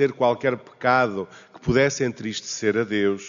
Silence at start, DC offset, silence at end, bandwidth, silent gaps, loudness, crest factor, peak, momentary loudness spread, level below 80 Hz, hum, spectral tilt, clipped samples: 0 s; under 0.1%; 0 s; 7.4 kHz; none; -23 LUFS; 18 dB; -6 dBFS; 10 LU; -52 dBFS; none; -4 dB/octave; under 0.1%